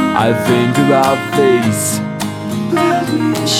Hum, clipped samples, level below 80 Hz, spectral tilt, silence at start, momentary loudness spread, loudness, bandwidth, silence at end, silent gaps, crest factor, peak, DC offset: none; under 0.1%; -50 dBFS; -4.5 dB/octave; 0 s; 8 LU; -14 LUFS; 17.5 kHz; 0 s; none; 14 dB; 0 dBFS; under 0.1%